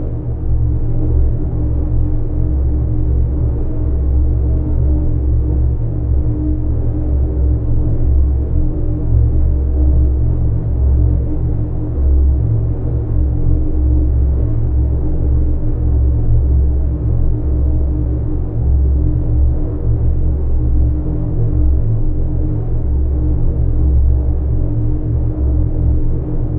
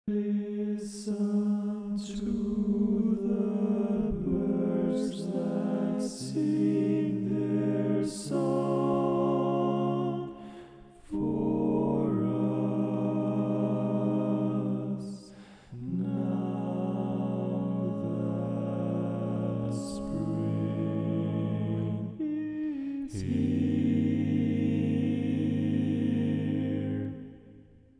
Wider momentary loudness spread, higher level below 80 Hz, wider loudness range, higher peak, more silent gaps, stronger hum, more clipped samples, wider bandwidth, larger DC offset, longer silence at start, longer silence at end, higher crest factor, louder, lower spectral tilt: second, 4 LU vs 7 LU; first, -14 dBFS vs -56 dBFS; about the same, 2 LU vs 3 LU; first, -2 dBFS vs -16 dBFS; neither; neither; neither; second, 1.7 kHz vs 10.5 kHz; neither; about the same, 0 s vs 0.05 s; second, 0 s vs 0.4 s; about the same, 12 dB vs 14 dB; first, -17 LUFS vs -30 LUFS; first, -14.5 dB/octave vs -8.5 dB/octave